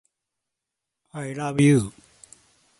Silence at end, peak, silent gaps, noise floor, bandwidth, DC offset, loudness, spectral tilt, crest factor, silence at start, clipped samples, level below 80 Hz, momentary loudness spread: 0.9 s; -6 dBFS; none; -84 dBFS; 11.5 kHz; under 0.1%; -22 LUFS; -6.5 dB/octave; 20 dB; 1.15 s; under 0.1%; -58 dBFS; 17 LU